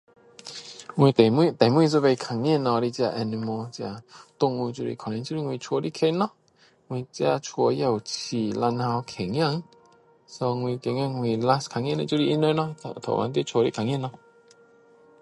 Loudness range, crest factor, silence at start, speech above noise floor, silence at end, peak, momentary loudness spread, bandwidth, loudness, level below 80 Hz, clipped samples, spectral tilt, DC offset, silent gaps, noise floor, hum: 6 LU; 22 dB; 0.45 s; 36 dB; 1.1 s; -2 dBFS; 14 LU; 11.5 kHz; -25 LUFS; -64 dBFS; under 0.1%; -6.5 dB/octave; under 0.1%; none; -60 dBFS; none